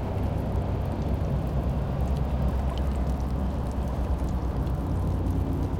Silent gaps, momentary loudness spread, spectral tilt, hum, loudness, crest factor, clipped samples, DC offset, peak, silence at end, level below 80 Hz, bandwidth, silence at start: none; 2 LU; -8.5 dB/octave; none; -29 LUFS; 12 dB; under 0.1%; under 0.1%; -16 dBFS; 0 s; -30 dBFS; 10.5 kHz; 0 s